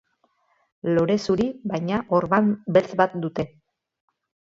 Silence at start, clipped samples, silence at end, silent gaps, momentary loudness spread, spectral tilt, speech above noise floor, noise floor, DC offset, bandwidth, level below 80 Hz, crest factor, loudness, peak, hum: 0.85 s; under 0.1%; 1.1 s; none; 9 LU; -7 dB/octave; 45 dB; -67 dBFS; under 0.1%; 7.8 kHz; -56 dBFS; 20 dB; -23 LUFS; -4 dBFS; none